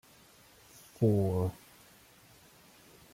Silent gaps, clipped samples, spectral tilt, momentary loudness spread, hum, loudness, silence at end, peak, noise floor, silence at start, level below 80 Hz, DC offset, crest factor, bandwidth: none; under 0.1%; -8.5 dB/octave; 27 LU; none; -31 LUFS; 1.6 s; -16 dBFS; -60 dBFS; 1 s; -64 dBFS; under 0.1%; 20 dB; 16.5 kHz